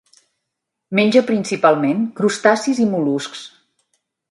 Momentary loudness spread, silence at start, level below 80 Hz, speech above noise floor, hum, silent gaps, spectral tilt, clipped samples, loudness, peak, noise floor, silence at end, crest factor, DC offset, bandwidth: 8 LU; 0.9 s; -68 dBFS; 62 dB; none; none; -5 dB/octave; under 0.1%; -17 LUFS; 0 dBFS; -79 dBFS; 0.8 s; 18 dB; under 0.1%; 11.5 kHz